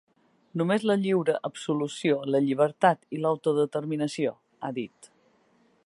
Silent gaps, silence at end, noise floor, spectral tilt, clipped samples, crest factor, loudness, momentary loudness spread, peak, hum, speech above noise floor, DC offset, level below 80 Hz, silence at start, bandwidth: none; 1 s; -65 dBFS; -6 dB/octave; under 0.1%; 22 dB; -27 LUFS; 11 LU; -6 dBFS; none; 39 dB; under 0.1%; -78 dBFS; 0.55 s; 11.5 kHz